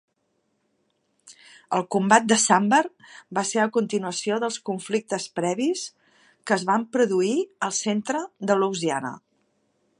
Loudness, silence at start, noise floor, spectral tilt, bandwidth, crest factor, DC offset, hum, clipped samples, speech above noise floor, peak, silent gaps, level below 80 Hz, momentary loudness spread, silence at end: -23 LUFS; 1.25 s; -72 dBFS; -3.5 dB/octave; 11.5 kHz; 24 dB; under 0.1%; none; under 0.1%; 49 dB; -2 dBFS; none; -76 dBFS; 11 LU; 0.8 s